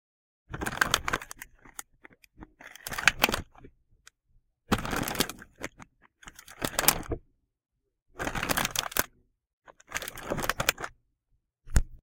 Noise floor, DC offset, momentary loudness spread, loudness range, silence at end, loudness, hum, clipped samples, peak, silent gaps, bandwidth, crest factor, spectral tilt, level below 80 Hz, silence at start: -75 dBFS; under 0.1%; 20 LU; 3 LU; 0.05 s; -29 LUFS; none; under 0.1%; -2 dBFS; 8.02-8.06 s, 9.53-9.62 s; 17 kHz; 32 dB; -2.5 dB/octave; -42 dBFS; 0.5 s